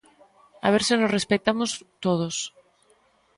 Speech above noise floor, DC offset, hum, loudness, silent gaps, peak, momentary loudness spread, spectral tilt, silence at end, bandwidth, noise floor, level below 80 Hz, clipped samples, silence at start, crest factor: 39 dB; under 0.1%; none; -24 LUFS; none; -6 dBFS; 9 LU; -4 dB/octave; 0.9 s; 11.5 kHz; -62 dBFS; -62 dBFS; under 0.1%; 0.65 s; 20 dB